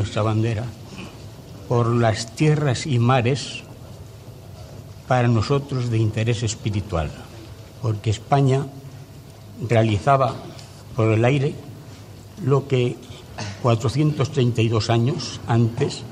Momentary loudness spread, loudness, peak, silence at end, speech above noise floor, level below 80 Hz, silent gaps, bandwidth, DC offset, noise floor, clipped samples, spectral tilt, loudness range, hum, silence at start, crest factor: 21 LU; -21 LUFS; -4 dBFS; 0 s; 21 dB; -50 dBFS; none; 11 kHz; under 0.1%; -41 dBFS; under 0.1%; -6.5 dB/octave; 2 LU; none; 0 s; 18 dB